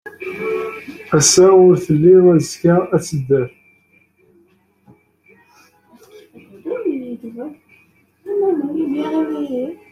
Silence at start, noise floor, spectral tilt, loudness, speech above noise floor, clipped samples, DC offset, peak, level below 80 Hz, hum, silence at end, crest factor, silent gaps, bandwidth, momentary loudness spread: 0.05 s; -56 dBFS; -5 dB/octave; -15 LUFS; 43 dB; under 0.1%; under 0.1%; 0 dBFS; -54 dBFS; none; 0.15 s; 18 dB; none; 14 kHz; 20 LU